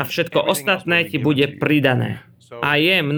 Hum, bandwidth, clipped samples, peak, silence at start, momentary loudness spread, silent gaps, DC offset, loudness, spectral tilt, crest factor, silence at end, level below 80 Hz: none; over 20 kHz; under 0.1%; -4 dBFS; 0 s; 7 LU; none; under 0.1%; -18 LUFS; -5 dB/octave; 16 dB; 0 s; -60 dBFS